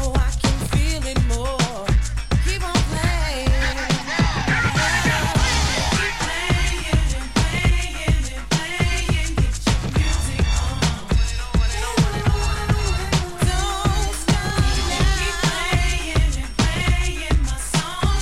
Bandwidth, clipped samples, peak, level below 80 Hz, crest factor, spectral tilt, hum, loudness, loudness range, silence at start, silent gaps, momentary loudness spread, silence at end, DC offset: 14.5 kHz; under 0.1%; -6 dBFS; -22 dBFS; 14 dB; -4.5 dB/octave; none; -21 LUFS; 2 LU; 0 s; none; 4 LU; 0 s; 1%